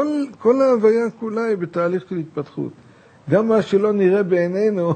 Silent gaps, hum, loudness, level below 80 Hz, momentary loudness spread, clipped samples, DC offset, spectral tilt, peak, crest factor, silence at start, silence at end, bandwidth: none; none; -19 LUFS; -68 dBFS; 13 LU; under 0.1%; under 0.1%; -8 dB/octave; -4 dBFS; 16 dB; 0 s; 0 s; 9 kHz